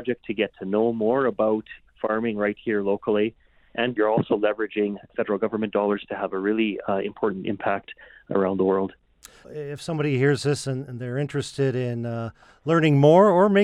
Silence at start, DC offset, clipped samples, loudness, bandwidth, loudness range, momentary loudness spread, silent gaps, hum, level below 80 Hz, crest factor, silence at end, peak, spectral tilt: 0 s; under 0.1%; under 0.1%; -24 LUFS; 11.5 kHz; 3 LU; 11 LU; none; none; -60 dBFS; 18 dB; 0 s; -6 dBFS; -7 dB/octave